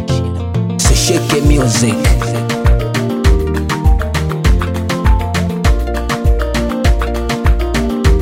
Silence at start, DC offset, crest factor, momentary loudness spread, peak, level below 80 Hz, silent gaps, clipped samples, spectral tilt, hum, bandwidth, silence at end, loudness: 0 s; under 0.1%; 12 dB; 6 LU; 0 dBFS; -16 dBFS; none; under 0.1%; -5 dB/octave; none; 16 kHz; 0 s; -14 LUFS